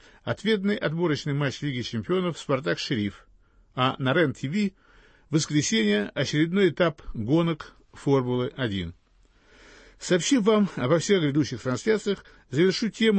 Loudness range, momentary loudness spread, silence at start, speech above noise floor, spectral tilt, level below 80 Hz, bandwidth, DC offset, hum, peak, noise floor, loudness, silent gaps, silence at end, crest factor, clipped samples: 3 LU; 9 LU; 0.25 s; 35 dB; -5 dB/octave; -54 dBFS; 8.8 kHz; under 0.1%; none; -10 dBFS; -60 dBFS; -25 LUFS; none; 0 s; 16 dB; under 0.1%